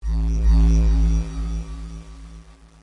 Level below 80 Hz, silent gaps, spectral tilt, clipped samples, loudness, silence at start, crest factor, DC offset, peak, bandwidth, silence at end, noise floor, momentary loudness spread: -20 dBFS; none; -7.5 dB/octave; under 0.1%; -21 LUFS; 0.05 s; 12 dB; under 0.1%; -8 dBFS; 6.4 kHz; 0.4 s; -44 dBFS; 22 LU